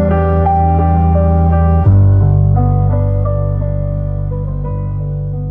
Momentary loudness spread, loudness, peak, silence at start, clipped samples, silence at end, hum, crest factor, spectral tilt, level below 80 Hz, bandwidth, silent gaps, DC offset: 10 LU; -13 LUFS; 0 dBFS; 0 s; under 0.1%; 0 s; none; 10 dB; -12.5 dB/octave; -22 dBFS; 2.9 kHz; none; under 0.1%